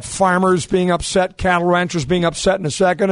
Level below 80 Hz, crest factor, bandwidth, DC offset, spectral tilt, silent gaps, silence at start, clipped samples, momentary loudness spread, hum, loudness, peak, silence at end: -38 dBFS; 14 dB; 11 kHz; under 0.1%; -5 dB/octave; none; 0 s; under 0.1%; 3 LU; none; -17 LUFS; -2 dBFS; 0 s